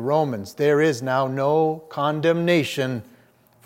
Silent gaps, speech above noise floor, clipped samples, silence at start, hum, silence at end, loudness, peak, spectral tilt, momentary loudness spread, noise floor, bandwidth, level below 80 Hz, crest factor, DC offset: none; 35 dB; under 0.1%; 0 s; none; 0.65 s; -22 LUFS; -6 dBFS; -6 dB/octave; 7 LU; -56 dBFS; 16.5 kHz; -70 dBFS; 16 dB; under 0.1%